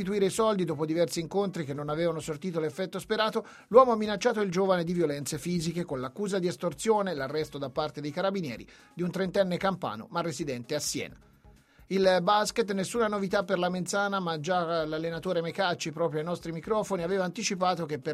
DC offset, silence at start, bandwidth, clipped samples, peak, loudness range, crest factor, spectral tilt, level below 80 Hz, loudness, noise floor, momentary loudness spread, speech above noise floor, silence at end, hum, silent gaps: under 0.1%; 0 s; 15 kHz; under 0.1%; -6 dBFS; 5 LU; 24 dB; -5 dB/octave; -62 dBFS; -29 LUFS; -58 dBFS; 9 LU; 29 dB; 0 s; none; none